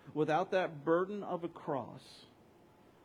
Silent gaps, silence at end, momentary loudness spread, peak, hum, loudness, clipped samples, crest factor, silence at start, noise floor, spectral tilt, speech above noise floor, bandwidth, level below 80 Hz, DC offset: none; 0.8 s; 20 LU; -18 dBFS; none; -35 LUFS; under 0.1%; 18 dB; 0.05 s; -63 dBFS; -7 dB/octave; 27 dB; 11.5 kHz; -80 dBFS; under 0.1%